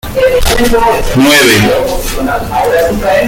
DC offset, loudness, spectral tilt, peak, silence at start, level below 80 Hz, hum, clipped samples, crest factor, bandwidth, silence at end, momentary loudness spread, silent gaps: under 0.1%; -9 LUFS; -4 dB/octave; 0 dBFS; 0.05 s; -20 dBFS; none; 0.1%; 8 dB; 17.5 kHz; 0 s; 9 LU; none